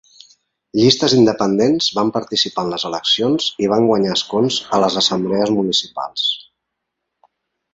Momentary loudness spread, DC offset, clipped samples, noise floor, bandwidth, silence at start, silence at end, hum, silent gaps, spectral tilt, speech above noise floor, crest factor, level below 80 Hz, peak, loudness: 7 LU; under 0.1%; under 0.1%; -77 dBFS; 8 kHz; 0.75 s; 1.3 s; none; none; -4.5 dB/octave; 61 dB; 16 dB; -56 dBFS; 0 dBFS; -16 LUFS